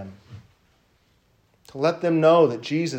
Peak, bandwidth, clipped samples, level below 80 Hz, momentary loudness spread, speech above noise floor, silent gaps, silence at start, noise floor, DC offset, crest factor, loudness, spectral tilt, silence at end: -4 dBFS; 9.2 kHz; under 0.1%; -68 dBFS; 21 LU; 43 dB; none; 0 s; -63 dBFS; under 0.1%; 18 dB; -20 LUFS; -6.5 dB/octave; 0 s